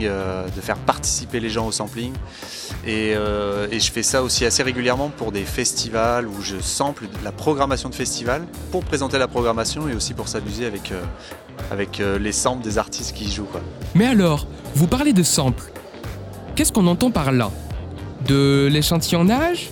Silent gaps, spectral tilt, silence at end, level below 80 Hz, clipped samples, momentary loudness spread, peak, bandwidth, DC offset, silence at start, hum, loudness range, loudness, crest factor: none; -4.5 dB/octave; 0 s; -36 dBFS; under 0.1%; 14 LU; 0 dBFS; 17.5 kHz; under 0.1%; 0 s; none; 5 LU; -21 LUFS; 22 dB